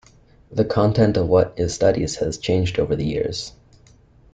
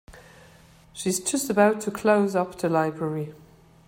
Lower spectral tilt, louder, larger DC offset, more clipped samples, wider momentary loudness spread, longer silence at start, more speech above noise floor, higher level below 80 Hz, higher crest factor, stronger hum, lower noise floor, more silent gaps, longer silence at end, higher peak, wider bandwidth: first, -6 dB/octave vs -4.5 dB/octave; first, -20 LUFS vs -24 LUFS; neither; neither; about the same, 9 LU vs 11 LU; first, 0.5 s vs 0.1 s; about the same, 32 dB vs 29 dB; first, -42 dBFS vs -60 dBFS; about the same, 16 dB vs 20 dB; neither; about the same, -51 dBFS vs -53 dBFS; neither; first, 0.85 s vs 0.5 s; about the same, -4 dBFS vs -6 dBFS; second, 9.4 kHz vs 16.5 kHz